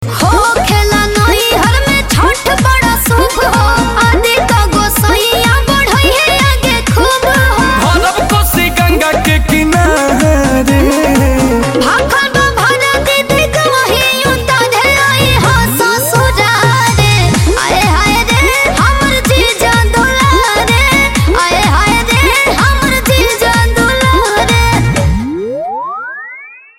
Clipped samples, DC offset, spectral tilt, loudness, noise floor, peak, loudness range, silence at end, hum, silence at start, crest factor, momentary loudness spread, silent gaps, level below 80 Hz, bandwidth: under 0.1%; under 0.1%; -4 dB/octave; -9 LUFS; -31 dBFS; 0 dBFS; 1 LU; 0.2 s; none; 0 s; 10 dB; 2 LU; none; -18 dBFS; 17 kHz